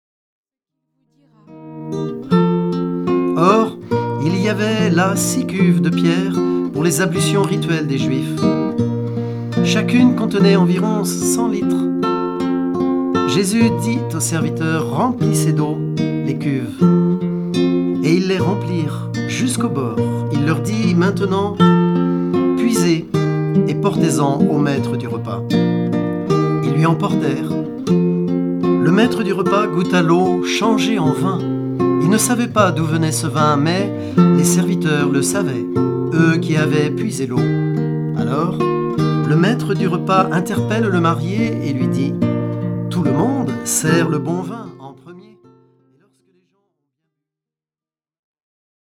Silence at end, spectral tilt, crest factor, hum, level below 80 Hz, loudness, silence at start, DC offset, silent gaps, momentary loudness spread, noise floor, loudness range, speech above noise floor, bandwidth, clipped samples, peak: 3.8 s; -6 dB/octave; 16 dB; none; -56 dBFS; -17 LUFS; 1.5 s; under 0.1%; none; 6 LU; under -90 dBFS; 3 LU; over 74 dB; 15 kHz; under 0.1%; 0 dBFS